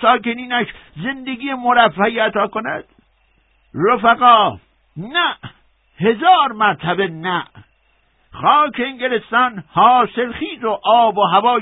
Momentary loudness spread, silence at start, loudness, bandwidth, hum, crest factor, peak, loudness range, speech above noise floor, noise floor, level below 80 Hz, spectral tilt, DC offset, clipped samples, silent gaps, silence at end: 13 LU; 0 s; -16 LUFS; 4 kHz; none; 16 dB; 0 dBFS; 3 LU; 43 dB; -59 dBFS; -54 dBFS; -9 dB/octave; under 0.1%; under 0.1%; none; 0 s